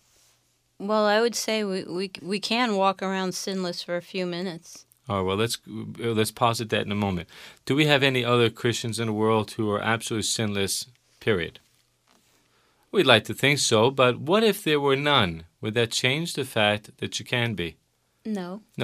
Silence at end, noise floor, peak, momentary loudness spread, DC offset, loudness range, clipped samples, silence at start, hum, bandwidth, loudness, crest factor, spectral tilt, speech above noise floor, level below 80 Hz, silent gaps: 0 s; -67 dBFS; -2 dBFS; 13 LU; under 0.1%; 6 LU; under 0.1%; 0.8 s; none; 15.5 kHz; -24 LUFS; 24 dB; -4 dB/octave; 42 dB; -60 dBFS; none